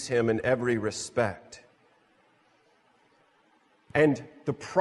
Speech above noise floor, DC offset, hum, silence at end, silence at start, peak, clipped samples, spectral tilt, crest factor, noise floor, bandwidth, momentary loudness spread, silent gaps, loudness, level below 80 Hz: 38 dB; under 0.1%; none; 0 s; 0 s; -10 dBFS; under 0.1%; -5.5 dB/octave; 20 dB; -65 dBFS; 11.5 kHz; 17 LU; none; -28 LUFS; -64 dBFS